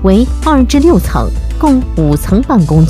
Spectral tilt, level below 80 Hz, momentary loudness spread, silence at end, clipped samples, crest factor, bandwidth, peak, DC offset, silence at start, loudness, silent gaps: -7.5 dB/octave; -16 dBFS; 6 LU; 0 s; 0.3%; 8 dB; 15.5 kHz; 0 dBFS; under 0.1%; 0 s; -10 LUFS; none